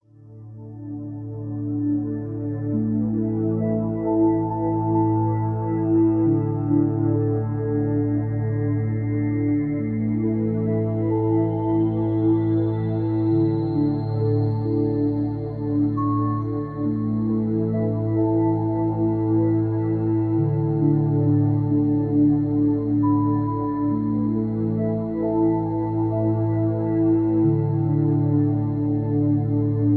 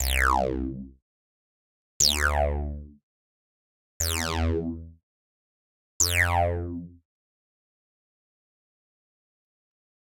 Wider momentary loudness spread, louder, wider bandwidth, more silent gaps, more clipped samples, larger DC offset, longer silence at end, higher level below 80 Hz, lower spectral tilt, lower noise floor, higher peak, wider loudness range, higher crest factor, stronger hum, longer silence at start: second, 5 LU vs 16 LU; first, -22 LUFS vs -25 LUFS; second, 4.4 kHz vs 17 kHz; second, none vs 1.02-2.00 s, 3.03-4.00 s, 5.03-6.00 s; neither; neither; second, 0 s vs 3.1 s; second, -48 dBFS vs -38 dBFS; first, -13.5 dB/octave vs -3 dB/octave; second, -43 dBFS vs under -90 dBFS; about the same, -8 dBFS vs -8 dBFS; second, 3 LU vs 6 LU; second, 12 dB vs 22 dB; neither; first, 0.25 s vs 0 s